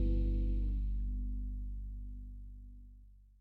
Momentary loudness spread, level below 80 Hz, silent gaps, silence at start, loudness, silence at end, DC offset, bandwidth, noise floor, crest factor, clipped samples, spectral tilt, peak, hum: 19 LU; -36 dBFS; none; 0 s; -40 LUFS; 0.15 s; under 0.1%; 2.7 kHz; -58 dBFS; 12 dB; under 0.1%; -10.5 dB/octave; -24 dBFS; none